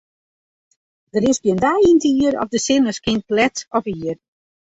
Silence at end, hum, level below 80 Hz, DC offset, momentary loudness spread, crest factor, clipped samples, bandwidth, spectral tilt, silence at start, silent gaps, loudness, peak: 0.65 s; none; -50 dBFS; under 0.1%; 12 LU; 16 dB; under 0.1%; 8 kHz; -4.5 dB/octave; 1.15 s; none; -18 LUFS; -2 dBFS